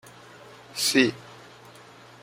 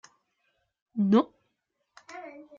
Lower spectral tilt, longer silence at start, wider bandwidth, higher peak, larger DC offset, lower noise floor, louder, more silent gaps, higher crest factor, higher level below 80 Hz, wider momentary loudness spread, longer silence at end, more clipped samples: second, -2.5 dB/octave vs -8 dB/octave; second, 0.75 s vs 0.95 s; first, 16.5 kHz vs 7.4 kHz; first, -4 dBFS vs -12 dBFS; neither; second, -49 dBFS vs -79 dBFS; first, -23 LUFS vs -26 LUFS; neither; about the same, 24 dB vs 20 dB; first, -70 dBFS vs -78 dBFS; first, 26 LU vs 21 LU; first, 0.9 s vs 0.3 s; neither